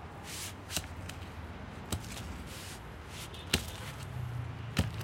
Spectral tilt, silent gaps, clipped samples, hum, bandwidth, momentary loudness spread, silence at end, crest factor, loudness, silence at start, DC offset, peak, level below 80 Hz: -3.5 dB/octave; none; under 0.1%; none; 16.5 kHz; 11 LU; 0 s; 34 dB; -39 LUFS; 0 s; under 0.1%; -6 dBFS; -50 dBFS